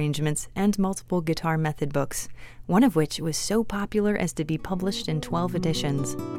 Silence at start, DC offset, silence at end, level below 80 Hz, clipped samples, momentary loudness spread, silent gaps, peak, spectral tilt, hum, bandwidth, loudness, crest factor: 0 s; under 0.1%; 0 s; -46 dBFS; under 0.1%; 7 LU; none; -8 dBFS; -5.5 dB/octave; none; 16.5 kHz; -26 LUFS; 18 dB